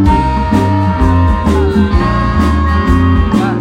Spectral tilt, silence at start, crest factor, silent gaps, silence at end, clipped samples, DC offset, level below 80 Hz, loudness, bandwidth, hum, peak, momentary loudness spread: -8 dB/octave; 0 s; 10 dB; none; 0 s; under 0.1%; under 0.1%; -16 dBFS; -11 LUFS; 10 kHz; none; 0 dBFS; 2 LU